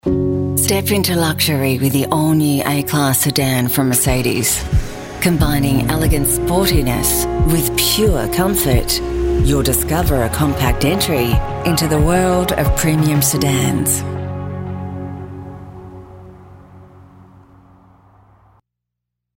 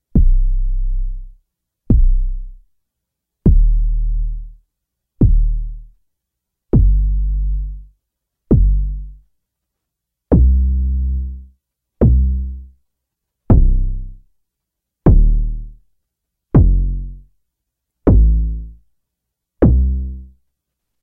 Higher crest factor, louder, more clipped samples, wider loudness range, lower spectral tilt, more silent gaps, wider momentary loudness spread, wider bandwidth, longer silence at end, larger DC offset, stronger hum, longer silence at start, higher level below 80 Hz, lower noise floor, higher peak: about the same, 16 dB vs 16 dB; about the same, -15 LUFS vs -17 LUFS; neither; first, 8 LU vs 3 LU; second, -4.5 dB/octave vs -13.5 dB/octave; neither; second, 12 LU vs 18 LU; first, 16.5 kHz vs 1.9 kHz; first, 2.5 s vs 0.8 s; neither; neither; about the same, 0.05 s vs 0.15 s; second, -26 dBFS vs -16 dBFS; about the same, -79 dBFS vs -80 dBFS; about the same, -2 dBFS vs 0 dBFS